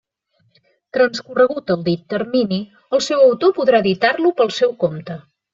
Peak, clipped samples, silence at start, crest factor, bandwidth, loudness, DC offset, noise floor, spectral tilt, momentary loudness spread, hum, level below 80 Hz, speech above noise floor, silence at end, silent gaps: -2 dBFS; under 0.1%; 0.95 s; 16 dB; 7.6 kHz; -17 LUFS; under 0.1%; -64 dBFS; -5.5 dB/octave; 10 LU; none; -62 dBFS; 47 dB; 0.35 s; none